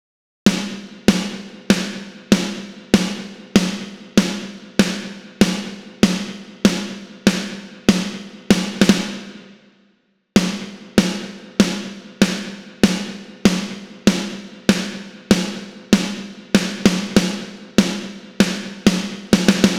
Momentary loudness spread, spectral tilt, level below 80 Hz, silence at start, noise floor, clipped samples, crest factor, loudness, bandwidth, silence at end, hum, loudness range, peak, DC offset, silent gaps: 12 LU; -4.5 dB/octave; -46 dBFS; 0.45 s; -62 dBFS; under 0.1%; 20 dB; -19 LUFS; 16.5 kHz; 0 s; none; 2 LU; 0 dBFS; under 0.1%; none